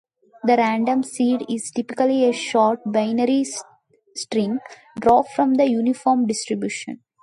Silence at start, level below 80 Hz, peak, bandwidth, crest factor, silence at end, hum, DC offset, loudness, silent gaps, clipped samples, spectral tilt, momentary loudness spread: 0.45 s; -60 dBFS; -4 dBFS; 11.5 kHz; 16 dB; 0.3 s; none; under 0.1%; -20 LUFS; none; under 0.1%; -4.5 dB/octave; 11 LU